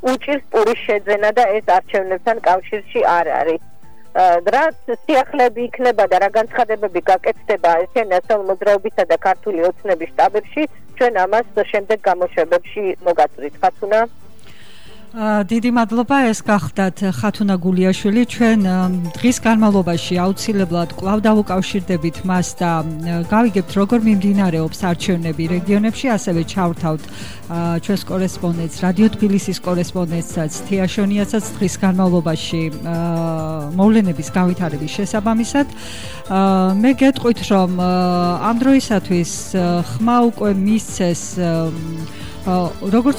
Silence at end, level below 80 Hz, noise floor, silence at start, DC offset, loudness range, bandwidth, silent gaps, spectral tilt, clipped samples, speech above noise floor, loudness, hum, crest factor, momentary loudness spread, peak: 0 s; -44 dBFS; -44 dBFS; 0.05 s; 2%; 3 LU; over 20 kHz; none; -6 dB/octave; under 0.1%; 28 dB; -17 LUFS; none; 14 dB; 7 LU; -4 dBFS